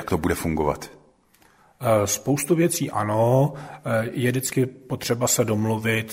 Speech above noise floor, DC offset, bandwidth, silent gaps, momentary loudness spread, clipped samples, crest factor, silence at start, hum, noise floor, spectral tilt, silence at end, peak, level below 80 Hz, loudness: 36 dB; under 0.1%; 16 kHz; none; 7 LU; under 0.1%; 18 dB; 0 s; none; -58 dBFS; -5 dB/octave; 0 s; -6 dBFS; -48 dBFS; -23 LUFS